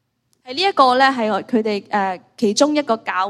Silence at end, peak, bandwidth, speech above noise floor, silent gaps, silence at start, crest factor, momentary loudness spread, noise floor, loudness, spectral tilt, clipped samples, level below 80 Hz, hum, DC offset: 0 s; 0 dBFS; 12.5 kHz; 28 dB; none; 0.45 s; 18 dB; 8 LU; -45 dBFS; -17 LUFS; -3.5 dB/octave; under 0.1%; -68 dBFS; none; under 0.1%